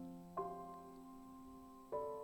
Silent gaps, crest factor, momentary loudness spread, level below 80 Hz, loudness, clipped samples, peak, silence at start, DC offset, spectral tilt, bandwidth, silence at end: none; 18 dB; 11 LU; -72 dBFS; -51 LUFS; under 0.1%; -32 dBFS; 0 s; under 0.1%; -7.5 dB/octave; 19 kHz; 0 s